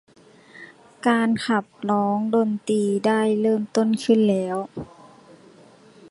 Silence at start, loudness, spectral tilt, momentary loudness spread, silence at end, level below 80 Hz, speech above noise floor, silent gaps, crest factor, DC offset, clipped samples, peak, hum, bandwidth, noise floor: 0.55 s; -22 LUFS; -6 dB/octave; 9 LU; 1.25 s; -64 dBFS; 29 dB; none; 16 dB; under 0.1%; under 0.1%; -6 dBFS; none; 11.5 kHz; -50 dBFS